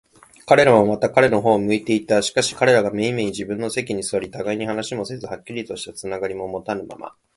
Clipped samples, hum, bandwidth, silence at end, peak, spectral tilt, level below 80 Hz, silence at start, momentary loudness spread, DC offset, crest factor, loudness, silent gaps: under 0.1%; none; 11.5 kHz; 0.3 s; 0 dBFS; -4.5 dB/octave; -54 dBFS; 0.45 s; 14 LU; under 0.1%; 20 dB; -20 LUFS; none